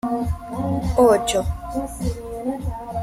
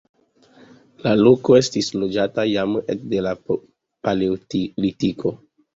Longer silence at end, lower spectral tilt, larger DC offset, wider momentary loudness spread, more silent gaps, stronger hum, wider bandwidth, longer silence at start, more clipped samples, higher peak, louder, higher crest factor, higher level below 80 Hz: second, 0 s vs 0.4 s; about the same, -6 dB/octave vs -6 dB/octave; neither; about the same, 13 LU vs 12 LU; neither; neither; first, 15.5 kHz vs 7.8 kHz; second, 0.05 s vs 1.05 s; neither; about the same, -4 dBFS vs -2 dBFS; about the same, -22 LUFS vs -20 LUFS; about the same, 18 dB vs 18 dB; first, -34 dBFS vs -54 dBFS